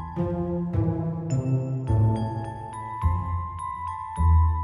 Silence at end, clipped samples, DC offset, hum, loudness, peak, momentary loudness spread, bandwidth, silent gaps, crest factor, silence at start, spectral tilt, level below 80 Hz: 0 s; under 0.1%; under 0.1%; none; -27 LUFS; -12 dBFS; 10 LU; 11 kHz; none; 14 dB; 0 s; -9 dB/octave; -32 dBFS